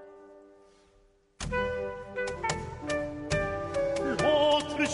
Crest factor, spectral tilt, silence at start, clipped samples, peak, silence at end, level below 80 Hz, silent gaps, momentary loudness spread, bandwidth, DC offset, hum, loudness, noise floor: 18 dB; -4 dB/octave; 0 s; under 0.1%; -14 dBFS; 0 s; -48 dBFS; none; 11 LU; 11 kHz; under 0.1%; none; -30 LUFS; -64 dBFS